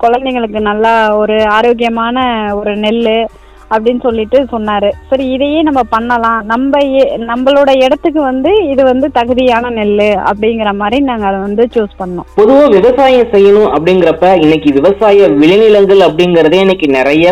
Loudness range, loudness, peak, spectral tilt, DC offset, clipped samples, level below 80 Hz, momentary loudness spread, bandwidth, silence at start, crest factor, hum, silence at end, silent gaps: 5 LU; -9 LUFS; 0 dBFS; -6.5 dB/octave; under 0.1%; 3%; -36 dBFS; 7 LU; 9.8 kHz; 0 s; 8 dB; none; 0 s; none